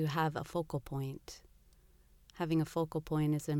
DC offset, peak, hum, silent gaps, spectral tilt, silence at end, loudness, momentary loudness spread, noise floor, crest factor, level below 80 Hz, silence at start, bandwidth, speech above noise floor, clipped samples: under 0.1%; -20 dBFS; 60 Hz at -70 dBFS; none; -7 dB/octave; 0 s; -36 LUFS; 13 LU; -64 dBFS; 16 dB; -60 dBFS; 0 s; 17 kHz; 29 dB; under 0.1%